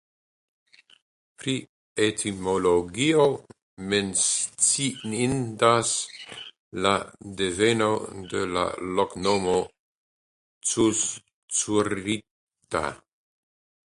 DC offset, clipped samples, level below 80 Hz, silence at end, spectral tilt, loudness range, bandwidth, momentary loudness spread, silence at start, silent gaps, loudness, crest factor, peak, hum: under 0.1%; under 0.1%; -56 dBFS; 0.9 s; -3 dB/octave; 4 LU; 11.5 kHz; 14 LU; 1.4 s; 1.69-1.96 s, 3.62-3.77 s, 6.59-6.71 s, 9.79-10.61 s, 11.33-11.48 s, 12.31-12.47 s; -25 LUFS; 22 dB; -4 dBFS; none